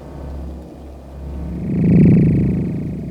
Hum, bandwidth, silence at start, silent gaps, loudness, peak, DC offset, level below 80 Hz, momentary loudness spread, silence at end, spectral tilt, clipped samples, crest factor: none; 3.1 kHz; 0 s; none; -15 LUFS; -2 dBFS; under 0.1%; -30 dBFS; 24 LU; 0 s; -11 dB/octave; under 0.1%; 16 dB